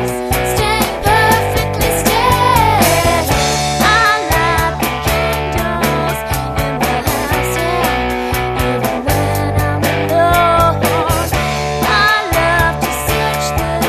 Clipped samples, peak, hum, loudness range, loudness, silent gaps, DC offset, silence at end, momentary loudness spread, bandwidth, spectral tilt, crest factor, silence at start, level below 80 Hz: under 0.1%; 0 dBFS; none; 4 LU; -13 LUFS; none; under 0.1%; 0 s; 6 LU; 14.5 kHz; -4 dB/octave; 14 dB; 0 s; -26 dBFS